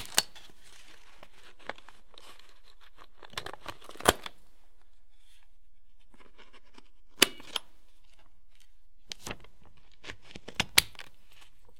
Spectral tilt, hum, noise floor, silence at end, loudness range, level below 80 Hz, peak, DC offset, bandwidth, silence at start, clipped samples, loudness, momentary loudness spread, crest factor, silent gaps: -1 dB/octave; none; -60 dBFS; 0.8 s; 13 LU; -56 dBFS; 0 dBFS; 0.8%; 16.5 kHz; 0 s; under 0.1%; -30 LUFS; 29 LU; 38 dB; none